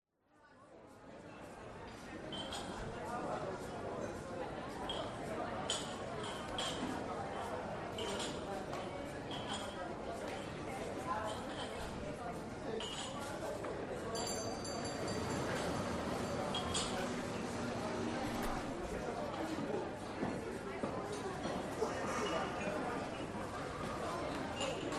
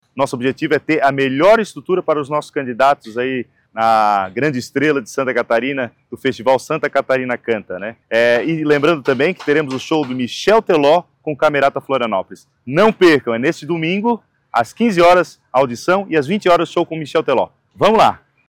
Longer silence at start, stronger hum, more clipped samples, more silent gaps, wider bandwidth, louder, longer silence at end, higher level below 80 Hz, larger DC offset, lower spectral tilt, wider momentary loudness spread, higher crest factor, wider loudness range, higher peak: first, 0.4 s vs 0.15 s; neither; neither; neither; second, 14 kHz vs 16.5 kHz; second, -41 LUFS vs -16 LUFS; second, 0 s vs 0.35 s; about the same, -58 dBFS vs -54 dBFS; neither; second, -4 dB/octave vs -5.5 dB/octave; second, 6 LU vs 9 LU; first, 18 dB vs 12 dB; about the same, 4 LU vs 3 LU; second, -24 dBFS vs -4 dBFS